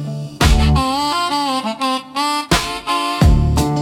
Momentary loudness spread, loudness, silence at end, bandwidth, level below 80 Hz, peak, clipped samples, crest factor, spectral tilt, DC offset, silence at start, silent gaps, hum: 6 LU; -17 LUFS; 0 s; 17 kHz; -22 dBFS; 0 dBFS; under 0.1%; 16 dB; -5 dB/octave; under 0.1%; 0 s; none; none